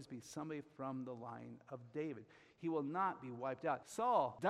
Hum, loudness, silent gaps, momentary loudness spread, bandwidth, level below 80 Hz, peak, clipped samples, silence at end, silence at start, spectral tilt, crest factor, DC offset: none; -43 LUFS; none; 15 LU; 15 kHz; -82 dBFS; -22 dBFS; under 0.1%; 0 s; 0 s; -6 dB/octave; 20 dB; under 0.1%